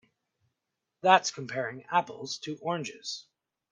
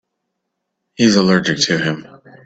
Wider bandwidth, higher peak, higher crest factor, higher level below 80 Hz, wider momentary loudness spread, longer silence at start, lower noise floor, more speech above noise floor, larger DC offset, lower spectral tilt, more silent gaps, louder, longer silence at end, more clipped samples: first, 10 kHz vs 8.2 kHz; second, -6 dBFS vs 0 dBFS; first, 26 dB vs 18 dB; second, -78 dBFS vs -54 dBFS; first, 15 LU vs 9 LU; about the same, 1.05 s vs 1 s; first, -85 dBFS vs -75 dBFS; second, 56 dB vs 61 dB; neither; second, -3 dB/octave vs -4.5 dB/octave; neither; second, -29 LUFS vs -15 LUFS; about the same, 0.5 s vs 0.4 s; neither